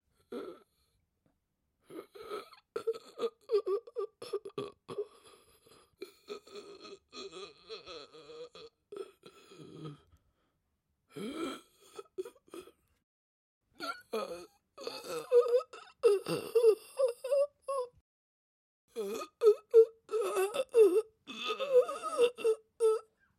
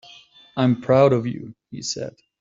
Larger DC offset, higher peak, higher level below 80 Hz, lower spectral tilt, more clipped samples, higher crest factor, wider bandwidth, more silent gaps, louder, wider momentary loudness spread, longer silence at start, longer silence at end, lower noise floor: neither; second, -12 dBFS vs -4 dBFS; second, -82 dBFS vs -60 dBFS; second, -4 dB/octave vs -6 dB/octave; neither; about the same, 22 dB vs 18 dB; first, 14.5 kHz vs 7.8 kHz; first, 13.03-13.61 s, 18.01-18.88 s vs none; second, -32 LUFS vs -21 LUFS; first, 23 LU vs 19 LU; second, 0.3 s vs 0.55 s; about the same, 0.35 s vs 0.3 s; first, -81 dBFS vs -49 dBFS